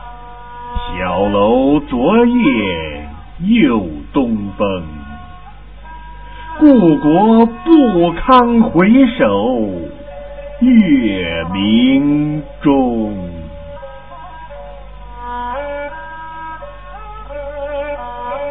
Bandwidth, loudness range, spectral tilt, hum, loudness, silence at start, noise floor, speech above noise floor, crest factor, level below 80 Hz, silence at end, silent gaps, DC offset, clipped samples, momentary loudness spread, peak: 4.6 kHz; 16 LU; -10.5 dB/octave; 50 Hz at -35 dBFS; -13 LUFS; 0 s; -35 dBFS; 24 dB; 14 dB; -34 dBFS; 0 s; none; 1%; under 0.1%; 23 LU; 0 dBFS